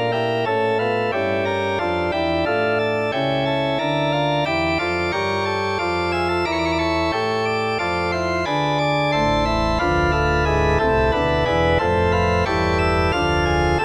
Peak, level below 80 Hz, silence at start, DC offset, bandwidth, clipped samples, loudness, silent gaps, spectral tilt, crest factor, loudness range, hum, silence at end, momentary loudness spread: -6 dBFS; -32 dBFS; 0 s; 0.2%; 12.5 kHz; under 0.1%; -20 LUFS; none; -6 dB/octave; 14 dB; 2 LU; none; 0 s; 3 LU